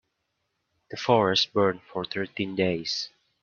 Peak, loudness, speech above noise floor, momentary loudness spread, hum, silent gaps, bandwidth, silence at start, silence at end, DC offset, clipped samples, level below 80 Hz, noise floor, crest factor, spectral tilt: -6 dBFS; -26 LUFS; 52 dB; 12 LU; none; none; 7.2 kHz; 0.9 s; 0.35 s; under 0.1%; under 0.1%; -68 dBFS; -78 dBFS; 22 dB; -4.5 dB/octave